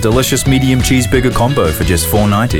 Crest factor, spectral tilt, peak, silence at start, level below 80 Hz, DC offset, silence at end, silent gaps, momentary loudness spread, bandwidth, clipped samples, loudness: 10 dB; -5 dB/octave; 0 dBFS; 0 s; -24 dBFS; 0.8%; 0 s; none; 2 LU; 19.5 kHz; under 0.1%; -12 LUFS